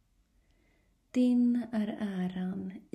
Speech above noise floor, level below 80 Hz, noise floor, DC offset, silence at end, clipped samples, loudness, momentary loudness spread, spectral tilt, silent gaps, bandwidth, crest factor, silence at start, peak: 40 dB; -70 dBFS; -69 dBFS; under 0.1%; 0.15 s; under 0.1%; -31 LUFS; 10 LU; -8 dB/octave; none; 9.8 kHz; 14 dB; 1.15 s; -18 dBFS